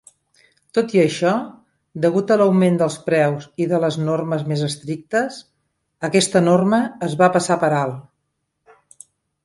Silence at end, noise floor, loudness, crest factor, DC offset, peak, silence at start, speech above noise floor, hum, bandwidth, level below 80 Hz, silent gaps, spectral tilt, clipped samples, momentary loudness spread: 1.45 s; -74 dBFS; -19 LUFS; 18 dB; under 0.1%; -2 dBFS; 0.75 s; 56 dB; none; 11.5 kHz; -64 dBFS; none; -5.5 dB/octave; under 0.1%; 11 LU